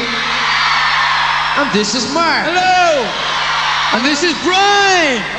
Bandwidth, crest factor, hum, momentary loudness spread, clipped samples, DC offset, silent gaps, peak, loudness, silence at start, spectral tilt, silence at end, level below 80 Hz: 10.5 kHz; 12 dB; none; 5 LU; under 0.1%; under 0.1%; none; 0 dBFS; -12 LUFS; 0 s; -2 dB/octave; 0 s; -44 dBFS